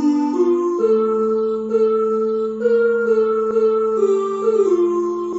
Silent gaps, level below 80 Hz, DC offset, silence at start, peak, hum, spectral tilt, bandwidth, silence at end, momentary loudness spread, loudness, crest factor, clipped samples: none; -62 dBFS; under 0.1%; 0 s; -6 dBFS; none; -6.5 dB/octave; 8 kHz; 0 s; 3 LU; -18 LUFS; 10 dB; under 0.1%